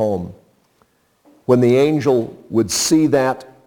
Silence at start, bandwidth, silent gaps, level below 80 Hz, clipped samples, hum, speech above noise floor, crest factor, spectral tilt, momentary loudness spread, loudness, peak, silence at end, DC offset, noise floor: 0 s; 19 kHz; none; -54 dBFS; under 0.1%; none; 44 dB; 18 dB; -5 dB/octave; 11 LU; -16 LUFS; 0 dBFS; 0.2 s; under 0.1%; -60 dBFS